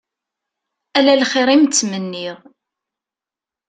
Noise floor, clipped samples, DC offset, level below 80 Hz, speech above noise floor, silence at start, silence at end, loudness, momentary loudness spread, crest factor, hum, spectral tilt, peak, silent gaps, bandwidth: -89 dBFS; under 0.1%; under 0.1%; -66 dBFS; 73 dB; 0.95 s; 1.35 s; -15 LUFS; 14 LU; 18 dB; none; -3 dB/octave; 0 dBFS; none; 9.4 kHz